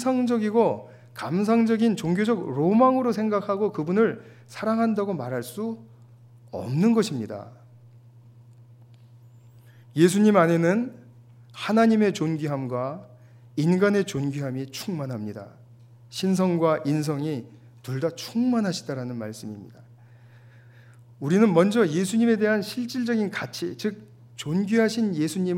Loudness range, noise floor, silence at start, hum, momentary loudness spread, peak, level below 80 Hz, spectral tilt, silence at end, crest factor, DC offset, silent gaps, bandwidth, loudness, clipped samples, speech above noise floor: 7 LU; -50 dBFS; 0 s; none; 16 LU; -6 dBFS; -70 dBFS; -6.5 dB/octave; 0 s; 20 dB; under 0.1%; none; 16 kHz; -24 LUFS; under 0.1%; 27 dB